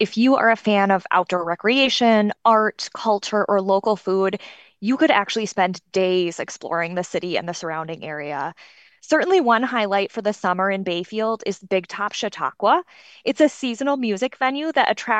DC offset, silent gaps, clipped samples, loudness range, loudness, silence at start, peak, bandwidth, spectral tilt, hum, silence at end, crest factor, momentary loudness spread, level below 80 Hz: under 0.1%; none; under 0.1%; 5 LU; -21 LUFS; 0 s; -2 dBFS; 9 kHz; -4.5 dB/octave; none; 0 s; 18 dB; 10 LU; -70 dBFS